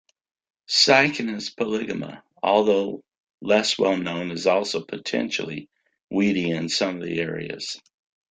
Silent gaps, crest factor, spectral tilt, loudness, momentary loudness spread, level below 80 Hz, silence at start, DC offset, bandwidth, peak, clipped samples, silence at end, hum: 3.17-3.27 s, 3.34-3.38 s, 6.03-6.08 s; 22 dB; -3.5 dB/octave; -23 LUFS; 14 LU; -66 dBFS; 0.7 s; under 0.1%; 9.6 kHz; -2 dBFS; under 0.1%; 0.55 s; none